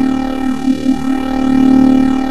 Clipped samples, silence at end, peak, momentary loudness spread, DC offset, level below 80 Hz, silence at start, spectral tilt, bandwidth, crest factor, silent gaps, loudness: under 0.1%; 0 s; -2 dBFS; 8 LU; 6%; -34 dBFS; 0 s; -6.5 dB/octave; 12 kHz; 10 dB; none; -13 LUFS